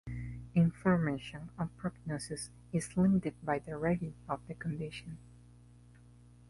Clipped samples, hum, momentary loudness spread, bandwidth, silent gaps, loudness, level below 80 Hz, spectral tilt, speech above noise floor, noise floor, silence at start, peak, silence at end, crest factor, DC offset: under 0.1%; 60 Hz at -50 dBFS; 14 LU; 11.5 kHz; none; -35 LUFS; -56 dBFS; -7 dB/octave; 23 dB; -58 dBFS; 0.05 s; -18 dBFS; 1.3 s; 18 dB; under 0.1%